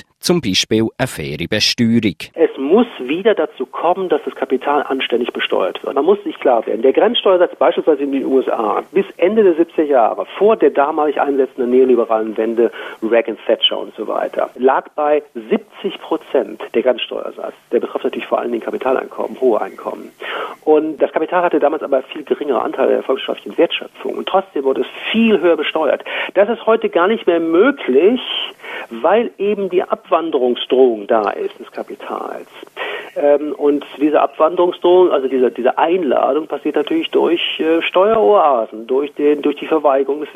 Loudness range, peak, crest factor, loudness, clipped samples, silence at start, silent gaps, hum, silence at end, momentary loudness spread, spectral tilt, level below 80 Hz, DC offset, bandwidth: 4 LU; 0 dBFS; 16 dB; -16 LUFS; under 0.1%; 0.25 s; none; none; 0.05 s; 10 LU; -5 dB/octave; -58 dBFS; under 0.1%; 14.5 kHz